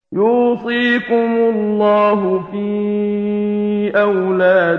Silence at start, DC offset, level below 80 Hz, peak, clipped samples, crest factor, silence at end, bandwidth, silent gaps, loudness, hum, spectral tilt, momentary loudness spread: 0.1 s; under 0.1%; -58 dBFS; -2 dBFS; under 0.1%; 14 dB; 0 s; 5.6 kHz; none; -15 LUFS; none; -8.5 dB/octave; 6 LU